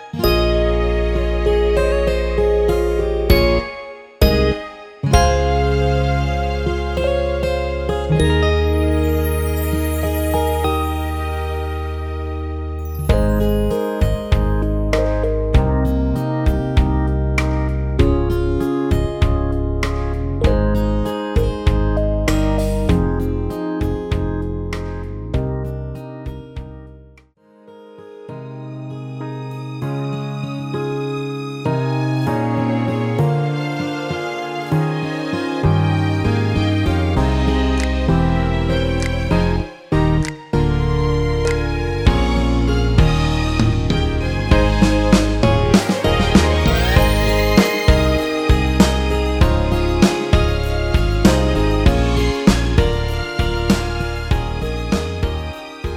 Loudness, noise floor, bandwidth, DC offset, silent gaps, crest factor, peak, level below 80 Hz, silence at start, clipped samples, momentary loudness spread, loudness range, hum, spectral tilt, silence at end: -18 LUFS; -49 dBFS; over 20 kHz; under 0.1%; none; 16 dB; 0 dBFS; -22 dBFS; 0 s; under 0.1%; 10 LU; 9 LU; none; -6.5 dB/octave; 0 s